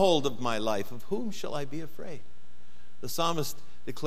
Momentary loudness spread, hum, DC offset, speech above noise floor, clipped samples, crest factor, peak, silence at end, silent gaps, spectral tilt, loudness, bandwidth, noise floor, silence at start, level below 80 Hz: 16 LU; none; 4%; 28 dB; under 0.1%; 20 dB; -10 dBFS; 0 s; none; -4.5 dB/octave; -32 LUFS; 16 kHz; -59 dBFS; 0 s; -64 dBFS